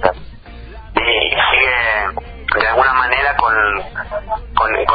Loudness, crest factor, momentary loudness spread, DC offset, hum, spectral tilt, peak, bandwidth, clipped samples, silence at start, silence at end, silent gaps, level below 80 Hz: -15 LUFS; 16 dB; 12 LU; under 0.1%; none; -6.5 dB/octave; 0 dBFS; 6 kHz; under 0.1%; 0 s; 0 s; none; -34 dBFS